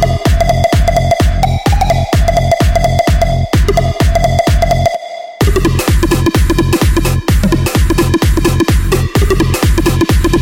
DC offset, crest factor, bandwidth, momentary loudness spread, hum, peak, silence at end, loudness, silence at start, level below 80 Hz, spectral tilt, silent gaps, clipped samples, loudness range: under 0.1%; 8 dB; 17 kHz; 2 LU; none; -2 dBFS; 0 s; -12 LUFS; 0 s; -14 dBFS; -6 dB/octave; none; under 0.1%; 1 LU